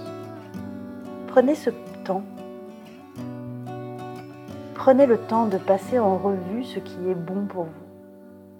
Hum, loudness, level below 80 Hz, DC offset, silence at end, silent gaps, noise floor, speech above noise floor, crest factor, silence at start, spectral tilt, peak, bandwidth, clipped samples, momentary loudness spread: none; -24 LUFS; -70 dBFS; under 0.1%; 0 s; none; -46 dBFS; 24 dB; 22 dB; 0 s; -7.5 dB/octave; -2 dBFS; 16 kHz; under 0.1%; 20 LU